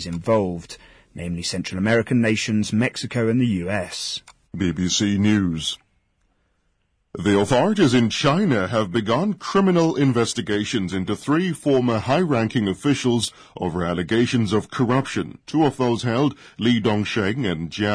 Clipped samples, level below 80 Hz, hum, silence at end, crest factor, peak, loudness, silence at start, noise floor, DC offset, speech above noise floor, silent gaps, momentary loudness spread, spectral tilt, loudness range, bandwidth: under 0.1%; -50 dBFS; none; 0 s; 14 dB; -8 dBFS; -21 LUFS; 0 s; -68 dBFS; under 0.1%; 47 dB; none; 9 LU; -5.5 dB/octave; 3 LU; 11 kHz